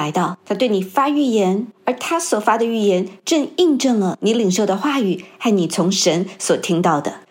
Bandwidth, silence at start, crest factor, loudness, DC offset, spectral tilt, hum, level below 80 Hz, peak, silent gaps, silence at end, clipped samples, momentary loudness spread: 16.5 kHz; 0 s; 16 dB; -18 LUFS; under 0.1%; -4.5 dB/octave; none; -74 dBFS; -2 dBFS; none; 0.1 s; under 0.1%; 6 LU